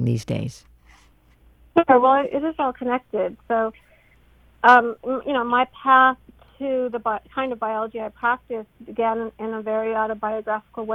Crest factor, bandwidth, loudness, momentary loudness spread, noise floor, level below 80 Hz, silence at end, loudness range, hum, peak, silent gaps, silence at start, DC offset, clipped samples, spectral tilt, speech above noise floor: 20 dB; 12 kHz; -21 LUFS; 13 LU; -55 dBFS; -56 dBFS; 0 s; 6 LU; none; -2 dBFS; none; 0 s; under 0.1%; under 0.1%; -6.5 dB/octave; 34 dB